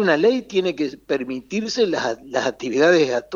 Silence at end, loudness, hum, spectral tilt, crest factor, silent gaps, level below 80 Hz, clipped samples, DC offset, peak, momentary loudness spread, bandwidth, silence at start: 0 s; -21 LUFS; none; -4.5 dB/octave; 18 dB; none; -60 dBFS; under 0.1%; under 0.1%; -4 dBFS; 10 LU; 7.4 kHz; 0 s